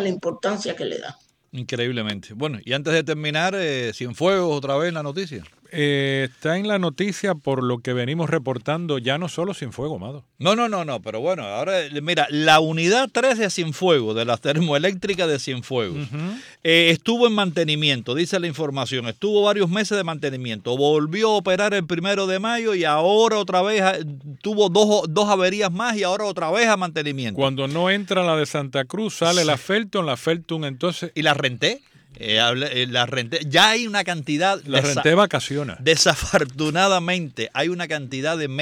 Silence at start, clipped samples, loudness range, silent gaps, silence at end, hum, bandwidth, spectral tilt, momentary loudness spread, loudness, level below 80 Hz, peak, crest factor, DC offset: 0 s; under 0.1%; 5 LU; none; 0 s; none; 16.5 kHz; -4 dB/octave; 10 LU; -21 LUFS; -56 dBFS; -4 dBFS; 18 dB; under 0.1%